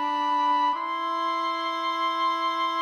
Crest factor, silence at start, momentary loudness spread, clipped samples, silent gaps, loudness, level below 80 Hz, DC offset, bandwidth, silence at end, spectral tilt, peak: 12 dB; 0 s; 4 LU; under 0.1%; none; -25 LUFS; -82 dBFS; under 0.1%; 11.5 kHz; 0 s; -1 dB/octave; -14 dBFS